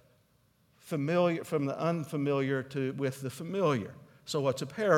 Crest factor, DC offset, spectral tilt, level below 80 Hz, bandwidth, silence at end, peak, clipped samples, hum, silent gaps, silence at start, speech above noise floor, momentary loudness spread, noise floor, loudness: 20 dB; under 0.1%; -6.5 dB/octave; -76 dBFS; 17 kHz; 0 s; -12 dBFS; under 0.1%; none; none; 0.85 s; 38 dB; 8 LU; -68 dBFS; -32 LUFS